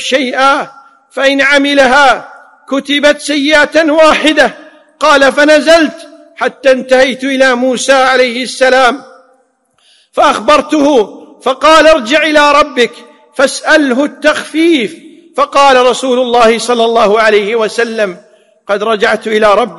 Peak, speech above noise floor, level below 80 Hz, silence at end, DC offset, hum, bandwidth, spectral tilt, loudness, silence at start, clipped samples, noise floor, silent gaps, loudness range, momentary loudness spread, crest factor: 0 dBFS; 46 dB; -44 dBFS; 0 s; 0.5%; none; 12 kHz; -2.5 dB/octave; -8 LUFS; 0 s; 0.7%; -54 dBFS; none; 2 LU; 10 LU; 10 dB